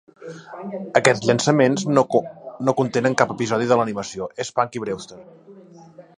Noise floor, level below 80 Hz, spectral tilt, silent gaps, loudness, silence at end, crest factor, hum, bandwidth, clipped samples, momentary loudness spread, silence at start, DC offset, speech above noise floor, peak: -45 dBFS; -62 dBFS; -5 dB/octave; none; -20 LUFS; 0.2 s; 22 dB; none; 11 kHz; under 0.1%; 18 LU; 0.2 s; under 0.1%; 25 dB; 0 dBFS